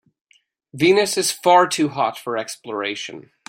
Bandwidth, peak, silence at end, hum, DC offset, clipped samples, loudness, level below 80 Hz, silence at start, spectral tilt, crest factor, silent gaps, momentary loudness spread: 16.5 kHz; -2 dBFS; 0.25 s; none; under 0.1%; under 0.1%; -19 LUFS; -66 dBFS; 0.75 s; -3.5 dB/octave; 18 dB; none; 13 LU